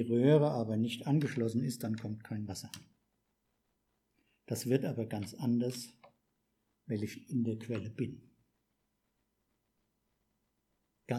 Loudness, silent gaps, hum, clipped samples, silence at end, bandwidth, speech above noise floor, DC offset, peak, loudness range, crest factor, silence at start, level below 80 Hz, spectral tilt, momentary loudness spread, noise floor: -35 LUFS; none; none; under 0.1%; 0 s; 15 kHz; 47 dB; under 0.1%; -14 dBFS; 7 LU; 22 dB; 0 s; -78 dBFS; -7 dB/octave; 14 LU; -81 dBFS